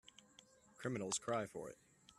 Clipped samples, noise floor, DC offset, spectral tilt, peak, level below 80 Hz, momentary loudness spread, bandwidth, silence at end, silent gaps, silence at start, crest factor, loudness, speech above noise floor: under 0.1%; -68 dBFS; under 0.1%; -3.5 dB/octave; -26 dBFS; -80 dBFS; 24 LU; 14 kHz; 0.05 s; none; 0.8 s; 20 dB; -44 LUFS; 24 dB